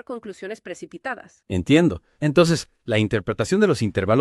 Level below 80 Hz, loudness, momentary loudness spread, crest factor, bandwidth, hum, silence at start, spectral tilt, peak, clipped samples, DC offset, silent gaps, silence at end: -50 dBFS; -21 LUFS; 17 LU; 20 dB; 12.5 kHz; none; 0.1 s; -6 dB/octave; -2 dBFS; under 0.1%; under 0.1%; none; 0 s